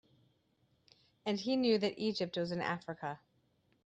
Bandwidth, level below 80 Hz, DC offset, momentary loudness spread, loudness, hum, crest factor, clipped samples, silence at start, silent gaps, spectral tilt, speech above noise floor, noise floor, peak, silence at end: 9.2 kHz; -78 dBFS; under 0.1%; 12 LU; -36 LUFS; none; 20 dB; under 0.1%; 1.25 s; none; -6 dB/octave; 40 dB; -75 dBFS; -18 dBFS; 0.7 s